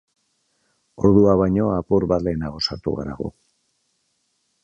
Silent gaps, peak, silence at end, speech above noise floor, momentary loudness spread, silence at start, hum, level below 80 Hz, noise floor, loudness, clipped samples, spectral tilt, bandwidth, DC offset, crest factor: none; -2 dBFS; 1.35 s; 51 dB; 14 LU; 1 s; none; -42 dBFS; -70 dBFS; -20 LUFS; under 0.1%; -8 dB/octave; 7.8 kHz; under 0.1%; 20 dB